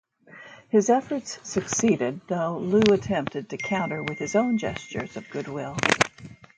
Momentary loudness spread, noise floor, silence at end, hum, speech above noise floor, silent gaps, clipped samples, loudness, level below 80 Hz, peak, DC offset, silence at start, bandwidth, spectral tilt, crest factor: 12 LU; -48 dBFS; 0.25 s; none; 23 dB; none; under 0.1%; -25 LUFS; -58 dBFS; 0 dBFS; under 0.1%; 0.3 s; 9.4 kHz; -4.5 dB/octave; 26 dB